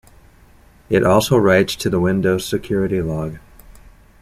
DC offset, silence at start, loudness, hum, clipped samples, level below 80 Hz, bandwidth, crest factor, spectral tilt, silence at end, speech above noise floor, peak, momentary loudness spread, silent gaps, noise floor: under 0.1%; 0.9 s; -17 LUFS; none; under 0.1%; -42 dBFS; 15.5 kHz; 16 dB; -5.5 dB/octave; 0.85 s; 32 dB; -2 dBFS; 9 LU; none; -48 dBFS